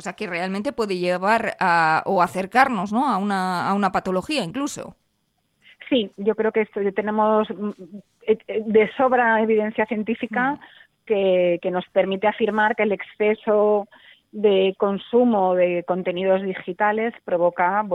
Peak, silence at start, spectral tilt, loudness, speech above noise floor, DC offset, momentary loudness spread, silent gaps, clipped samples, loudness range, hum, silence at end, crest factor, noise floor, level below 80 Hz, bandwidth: -2 dBFS; 0 s; -5.5 dB/octave; -21 LUFS; 49 dB; under 0.1%; 7 LU; none; under 0.1%; 4 LU; none; 0 s; 20 dB; -70 dBFS; -62 dBFS; 13 kHz